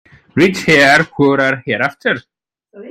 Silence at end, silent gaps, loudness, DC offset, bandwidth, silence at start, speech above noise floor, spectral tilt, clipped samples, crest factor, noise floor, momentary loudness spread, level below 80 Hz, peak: 0 s; none; -13 LUFS; under 0.1%; 16 kHz; 0.35 s; 29 dB; -5 dB/octave; under 0.1%; 14 dB; -42 dBFS; 10 LU; -50 dBFS; 0 dBFS